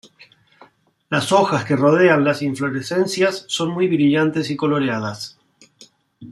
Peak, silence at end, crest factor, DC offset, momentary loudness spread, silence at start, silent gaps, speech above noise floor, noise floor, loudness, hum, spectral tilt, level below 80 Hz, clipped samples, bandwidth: -2 dBFS; 0 s; 18 dB; under 0.1%; 10 LU; 1.1 s; none; 34 dB; -52 dBFS; -18 LUFS; none; -5.5 dB/octave; -64 dBFS; under 0.1%; 13 kHz